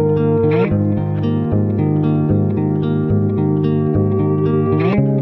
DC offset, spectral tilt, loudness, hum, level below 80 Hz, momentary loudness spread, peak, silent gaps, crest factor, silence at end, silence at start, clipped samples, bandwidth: under 0.1%; -12 dB/octave; -16 LUFS; none; -40 dBFS; 3 LU; -4 dBFS; none; 12 dB; 0 s; 0 s; under 0.1%; 4.3 kHz